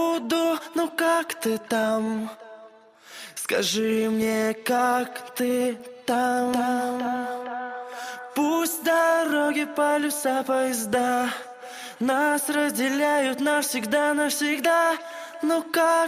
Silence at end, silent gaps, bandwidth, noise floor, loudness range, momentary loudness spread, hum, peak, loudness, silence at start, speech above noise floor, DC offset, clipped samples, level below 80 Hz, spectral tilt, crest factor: 0 s; none; 15.5 kHz; -50 dBFS; 3 LU; 11 LU; none; -10 dBFS; -24 LUFS; 0 s; 26 dB; under 0.1%; under 0.1%; -70 dBFS; -3 dB/octave; 14 dB